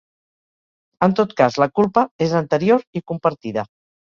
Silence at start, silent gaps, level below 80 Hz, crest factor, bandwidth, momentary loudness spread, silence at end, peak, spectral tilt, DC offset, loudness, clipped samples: 1 s; 2.11-2.19 s, 2.87-2.93 s; -58 dBFS; 18 dB; 7.4 kHz; 10 LU; 0.5 s; -2 dBFS; -7 dB/octave; under 0.1%; -19 LUFS; under 0.1%